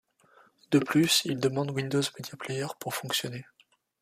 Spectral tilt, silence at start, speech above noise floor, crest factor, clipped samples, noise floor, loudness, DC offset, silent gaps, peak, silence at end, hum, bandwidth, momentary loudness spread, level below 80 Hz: -4 dB/octave; 0.7 s; 33 dB; 20 dB; under 0.1%; -61 dBFS; -28 LUFS; under 0.1%; none; -10 dBFS; 0.6 s; none; 15.5 kHz; 12 LU; -70 dBFS